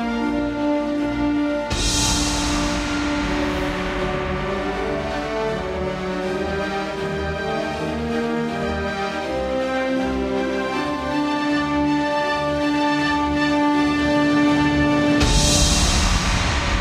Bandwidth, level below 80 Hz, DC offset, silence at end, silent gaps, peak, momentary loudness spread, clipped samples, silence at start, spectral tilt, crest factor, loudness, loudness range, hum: 14.5 kHz; -30 dBFS; under 0.1%; 0 s; none; -4 dBFS; 7 LU; under 0.1%; 0 s; -4 dB/octave; 16 dB; -21 LUFS; 7 LU; none